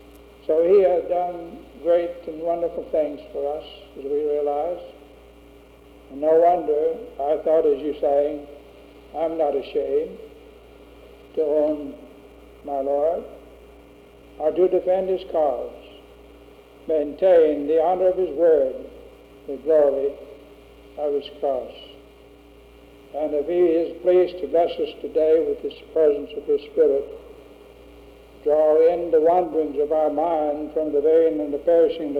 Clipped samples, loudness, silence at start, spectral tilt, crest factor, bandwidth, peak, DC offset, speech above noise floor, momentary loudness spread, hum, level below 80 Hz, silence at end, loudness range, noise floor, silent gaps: under 0.1%; -21 LUFS; 0.5 s; -7.5 dB/octave; 14 dB; 5 kHz; -8 dBFS; under 0.1%; 27 dB; 18 LU; none; -54 dBFS; 0 s; 7 LU; -48 dBFS; none